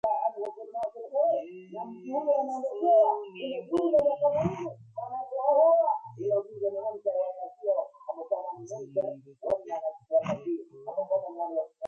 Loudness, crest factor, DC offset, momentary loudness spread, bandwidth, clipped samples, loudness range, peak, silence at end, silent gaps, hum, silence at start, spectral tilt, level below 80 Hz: -29 LUFS; 16 dB; under 0.1%; 15 LU; 7.4 kHz; under 0.1%; 6 LU; -12 dBFS; 0 s; none; none; 0.05 s; -7.5 dB/octave; -66 dBFS